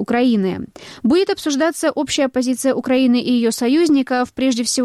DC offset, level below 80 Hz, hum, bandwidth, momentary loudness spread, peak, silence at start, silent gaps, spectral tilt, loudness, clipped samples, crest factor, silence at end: under 0.1%; -54 dBFS; none; 14 kHz; 5 LU; -6 dBFS; 0 s; none; -4 dB/octave; -17 LUFS; under 0.1%; 10 dB; 0 s